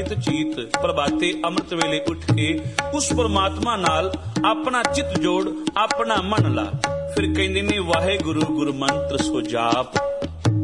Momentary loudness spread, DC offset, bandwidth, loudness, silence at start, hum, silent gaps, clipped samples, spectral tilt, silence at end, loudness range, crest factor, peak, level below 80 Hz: 4 LU; 0.2%; 11.5 kHz; -22 LUFS; 0 s; none; none; under 0.1%; -5 dB/octave; 0 s; 1 LU; 18 dB; -2 dBFS; -44 dBFS